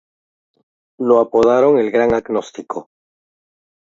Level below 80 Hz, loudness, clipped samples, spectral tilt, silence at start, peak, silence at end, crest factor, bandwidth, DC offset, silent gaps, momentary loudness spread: -52 dBFS; -15 LUFS; under 0.1%; -6.5 dB/octave; 1 s; 0 dBFS; 1.05 s; 18 dB; 7.6 kHz; under 0.1%; none; 16 LU